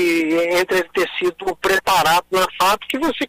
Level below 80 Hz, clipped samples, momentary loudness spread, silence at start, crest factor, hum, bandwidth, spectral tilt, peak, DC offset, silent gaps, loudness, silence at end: -48 dBFS; under 0.1%; 6 LU; 0 s; 12 dB; none; 16 kHz; -3 dB/octave; -6 dBFS; under 0.1%; none; -18 LUFS; 0 s